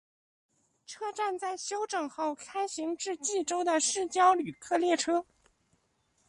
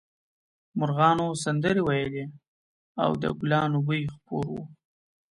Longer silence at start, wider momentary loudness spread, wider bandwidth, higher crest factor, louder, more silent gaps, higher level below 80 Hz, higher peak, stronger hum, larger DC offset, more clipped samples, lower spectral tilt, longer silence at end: first, 0.9 s vs 0.75 s; second, 10 LU vs 15 LU; about the same, 11.5 kHz vs 11.5 kHz; about the same, 20 dB vs 20 dB; second, -30 LUFS vs -27 LUFS; second, none vs 2.48-2.95 s; second, -76 dBFS vs -58 dBFS; second, -12 dBFS vs -8 dBFS; neither; neither; neither; second, -2 dB/octave vs -6.5 dB/octave; first, 1.05 s vs 0.55 s